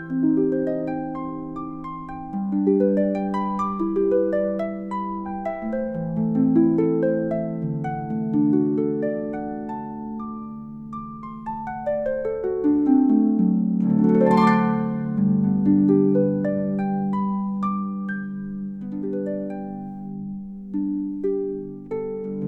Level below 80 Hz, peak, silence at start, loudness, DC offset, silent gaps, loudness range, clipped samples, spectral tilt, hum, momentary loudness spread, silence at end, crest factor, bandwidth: -52 dBFS; -6 dBFS; 0 s; -23 LUFS; under 0.1%; none; 10 LU; under 0.1%; -10 dB/octave; none; 14 LU; 0 s; 16 dB; 5.6 kHz